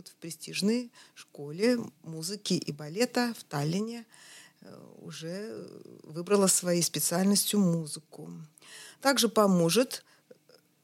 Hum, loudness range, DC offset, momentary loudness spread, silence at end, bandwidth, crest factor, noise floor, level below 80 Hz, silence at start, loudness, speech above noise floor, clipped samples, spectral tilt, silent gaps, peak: none; 7 LU; under 0.1%; 23 LU; 0.85 s; 16.5 kHz; 22 dB; -63 dBFS; -82 dBFS; 0.05 s; -28 LUFS; 33 dB; under 0.1%; -4 dB/octave; none; -10 dBFS